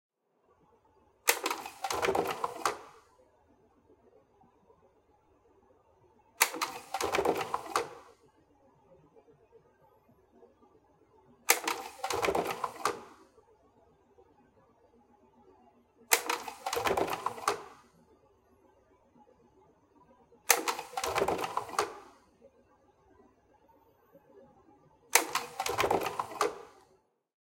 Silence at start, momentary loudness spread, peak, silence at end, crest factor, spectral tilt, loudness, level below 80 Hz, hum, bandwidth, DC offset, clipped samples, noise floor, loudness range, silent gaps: 1.25 s; 15 LU; -2 dBFS; 0.75 s; 34 dB; -1.5 dB/octave; -32 LUFS; -68 dBFS; none; 17 kHz; under 0.1%; under 0.1%; -71 dBFS; 8 LU; none